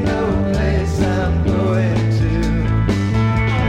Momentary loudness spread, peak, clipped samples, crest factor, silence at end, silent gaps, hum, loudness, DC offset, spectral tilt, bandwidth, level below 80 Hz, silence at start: 1 LU; -4 dBFS; under 0.1%; 12 dB; 0 s; none; none; -17 LUFS; under 0.1%; -7.5 dB/octave; 9.6 kHz; -24 dBFS; 0 s